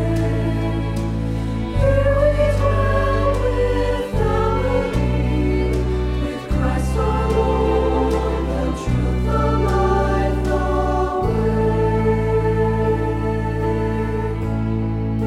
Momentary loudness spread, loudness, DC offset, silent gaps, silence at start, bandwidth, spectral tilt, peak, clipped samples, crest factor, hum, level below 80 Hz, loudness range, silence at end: 5 LU; -20 LUFS; under 0.1%; none; 0 s; 12.5 kHz; -8 dB/octave; -4 dBFS; under 0.1%; 14 dB; none; -24 dBFS; 2 LU; 0 s